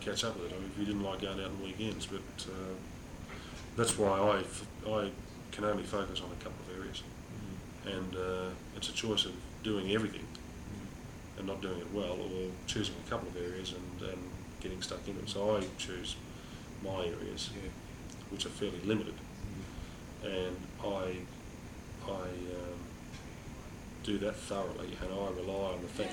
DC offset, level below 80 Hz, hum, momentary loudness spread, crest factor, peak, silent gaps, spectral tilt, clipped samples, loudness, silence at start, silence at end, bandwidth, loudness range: under 0.1%; -54 dBFS; none; 14 LU; 22 dB; -18 dBFS; none; -4.5 dB/octave; under 0.1%; -39 LUFS; 0 s; 0 s; over 20 kHz; 6 LU